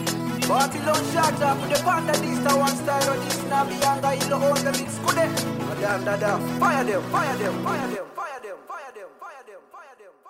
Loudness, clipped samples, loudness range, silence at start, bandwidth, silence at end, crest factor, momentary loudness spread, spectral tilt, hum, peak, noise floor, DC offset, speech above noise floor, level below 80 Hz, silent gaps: -23 LUFS; under 0.1%; 4 LU; 0 s; 16 kHz; 0 s; 18 dB; 15 LU; -4 dB/octave; none; -6 dBFS; -48 dBFS; under 0.1%; 25 dB; -58 dBFS; none